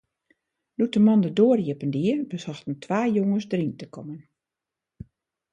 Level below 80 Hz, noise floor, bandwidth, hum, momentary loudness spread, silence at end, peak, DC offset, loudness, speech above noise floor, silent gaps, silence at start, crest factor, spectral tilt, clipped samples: -64 dBFS; -88 dBFS; 7.8 kHz; none; 19 LU; 1.35 s; -8 dBFS; under 0.1%; -24 LUFS; 65 dB; none; 0.8 s; 18 dB; -8 dB/octave; under 0.1%